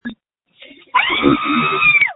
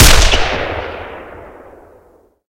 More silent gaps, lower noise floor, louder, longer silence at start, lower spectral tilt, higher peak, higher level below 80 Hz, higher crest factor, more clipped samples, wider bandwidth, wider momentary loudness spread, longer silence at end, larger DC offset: neither; about the same, -49 dBFS vs -49 dBFS; about the same, -14 LUFS vs -14 LUFS; about the same, 0.05 s vs 0 s; first, -8.5 dB/octave vs -2.5 dB/octave; about the same, 0 dBFS vs 0 dBFS; second, -48 dBFS vs -18 dBFS; about the same, 16 dB vs 14 dB; second, under 0.1% vs 0.7%; second, 4.1 kHz vs over 20 kHz; second, 7 LU vs 25 LU; second, 0 s vs 1.05 s; neither